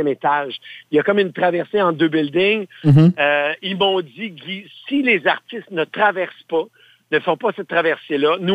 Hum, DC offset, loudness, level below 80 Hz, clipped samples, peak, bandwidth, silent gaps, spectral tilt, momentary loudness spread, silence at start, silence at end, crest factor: none; under 0.1%; -18 LUFS; -56 dBFS; under 0.1%; -2 dBFS; 8.2 kHz; none; -8 dB/octave; 13 LU; 0 s; 0 s; 16 dB